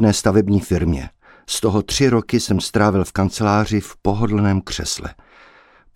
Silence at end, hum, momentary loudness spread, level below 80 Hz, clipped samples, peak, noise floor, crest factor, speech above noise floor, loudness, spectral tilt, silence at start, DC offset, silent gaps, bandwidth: 0.85 s; none; 8 LU; -36 dBFS; under 0.1%; -2 dBFS; -50 dBFS; 16 dB; 32 dB; -19 LUFS; -5.5 dB/octave; 0 s; under 0.1%; none; 16 kHz